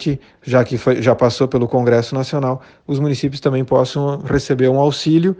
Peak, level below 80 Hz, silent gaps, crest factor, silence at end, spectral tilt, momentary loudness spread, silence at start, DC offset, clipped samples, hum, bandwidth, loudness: 0 dBFS; -44 dBFS; none; 16 dB; 0.05 s; -7 dB/octave; 6 LU; 0 s; under 0.1%; under 0.1%; none; 9.2 kHz; -17 LUFS